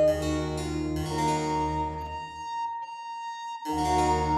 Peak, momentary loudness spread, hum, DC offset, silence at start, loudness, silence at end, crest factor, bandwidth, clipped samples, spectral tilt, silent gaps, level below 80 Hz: -14 dBFS; 12 LU; none; under 0.1%; 0 s; -30 LUFS; 0 s; 16 dB; 14 kHz; under 0.1%; -5.5 dB/octave; none; -42 dBFS